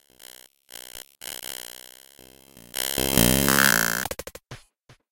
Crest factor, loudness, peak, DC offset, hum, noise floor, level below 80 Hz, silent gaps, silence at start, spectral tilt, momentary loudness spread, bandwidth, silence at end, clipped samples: 26 dB; -21 LUFS; 0 dBFS; under 0.1%; none; -57 dBFS; -44 dBFS; none; 0.95 s; -2.5 dB/octave; 24 LU; 17.5 kHz; 0.5 s; under 0.1%